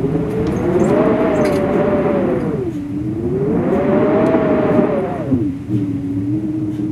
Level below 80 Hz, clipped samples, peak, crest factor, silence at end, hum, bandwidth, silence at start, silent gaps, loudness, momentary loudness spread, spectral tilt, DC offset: -38 dBFS; under 0.1%; 0 dBFS; 16 dB; 0 s; none; 12.5 kHz; 0 s; none; -17 LUFS; 7 LU; -8.5 dB/octave; under 0.1%